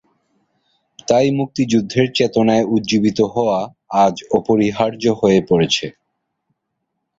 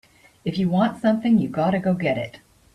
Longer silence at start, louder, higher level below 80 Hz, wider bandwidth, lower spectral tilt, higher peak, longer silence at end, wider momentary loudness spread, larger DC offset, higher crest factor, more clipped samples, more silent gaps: first, 1.1 s vs 0.45 s; first, -16 LUFS vs -22 LUFS; about the same, -52 dBFS vs -56 dBFS; second, 7.8 kHz vs 11 kHz; second, -5.5 dB/octave vs -8 dB/octave; first, -2 dBFS vs -6 dBFS; first, 1.3 s vs 0.4 s; second, 5 LU vs 9 LU; neither; about the same, 16 dB vs 16 dB; neither; neither